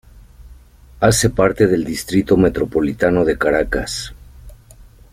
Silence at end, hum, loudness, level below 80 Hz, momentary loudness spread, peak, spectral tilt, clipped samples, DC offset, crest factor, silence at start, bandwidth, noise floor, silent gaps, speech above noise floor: 0.3 s; none; -17 LUFS; -36 dBFS; 7 LU; -2 dBFS; -5 dB/octave; under 0.1%; under 0.1%; 16 dB; 0.15 s; 16 kHz; -43 dBFS; none; 28 dB